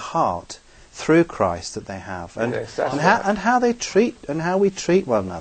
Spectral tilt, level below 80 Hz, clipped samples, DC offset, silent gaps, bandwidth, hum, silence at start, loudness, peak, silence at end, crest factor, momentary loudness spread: -5 dB/octave; -50 dBFS; under 0.1%; under 0.1%; none; 9.2 kHz; none; 0 s; -21 LUFS; -2 dBFS; 0 s; 20 dB; 14 LU